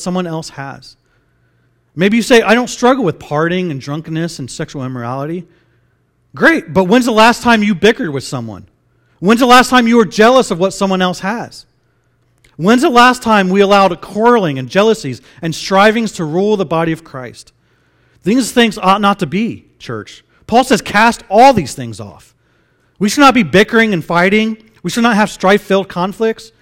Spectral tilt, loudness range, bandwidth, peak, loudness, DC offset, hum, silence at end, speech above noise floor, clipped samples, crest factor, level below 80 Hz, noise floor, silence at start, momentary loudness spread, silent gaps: -5 dB/octave; 5 LU; 16.5 kHz; 0 dBFS; -12 LUFS; under 0.1%; none; 0.15 s; 46 dB; 0.5%; 12 dB; -46 dBFS; -58 dBFS; 0 s; 16 LU; none